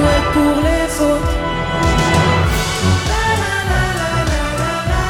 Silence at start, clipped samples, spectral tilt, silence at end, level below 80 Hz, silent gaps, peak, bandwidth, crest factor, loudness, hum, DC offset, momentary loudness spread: 0 s; under 0.1%; -5 dB/octave; 0 s; -24 dBFS; none; -2 dBFS; 18 kHz; 14 dB; -16 LUFS; none; under 0.1%; 5 LU